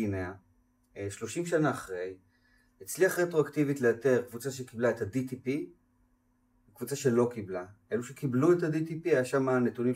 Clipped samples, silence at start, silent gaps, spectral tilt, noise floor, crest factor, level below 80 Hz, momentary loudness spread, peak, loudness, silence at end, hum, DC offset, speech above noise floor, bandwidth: under 0.1%; 0 s; none; -6 dB/octave; -70 dBFS; 18 dB; -70 dBFS; 14 LU; -14 dBFS; -30 LUFS; 0 s; none; under 0.1%; 40 dB; 16 kHz